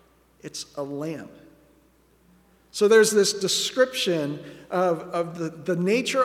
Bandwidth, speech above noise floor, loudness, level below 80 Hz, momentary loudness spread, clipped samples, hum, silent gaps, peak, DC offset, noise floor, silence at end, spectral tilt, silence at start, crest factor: 16 kHz; 36 dB; -23 LUFS; -66 dBFS; 19 LU; under 0.1%; none; none; -6 dBFS; under 0.1%; -60 dBFS; 0 s; -3.5 dB/octave; 0.45 s; 20 dB